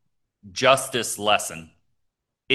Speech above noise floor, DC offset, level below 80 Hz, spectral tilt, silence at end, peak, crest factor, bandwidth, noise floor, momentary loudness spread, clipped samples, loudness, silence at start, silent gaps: 54 dB; under 0.1%; -62 dBFS; -2 dB/octave; 0 s; -2 dBFS; 22 dB; 12.5 kHz; -77 dBFS; 15 LU; under 0.1%; -22 LUFS; 0.45 s; none